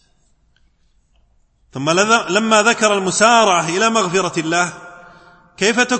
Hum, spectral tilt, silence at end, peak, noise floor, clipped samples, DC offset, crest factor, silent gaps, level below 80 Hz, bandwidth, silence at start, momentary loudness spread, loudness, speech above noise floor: none; -3 dB/octave; 0 s; 0 dBFS; -58 dBFS; under 0.1%; under 0.1%; 16 dB; none; -58 dBFS; 8.8 kHz; 1.75 s; 8 LU; -15 LUFS; 43 dB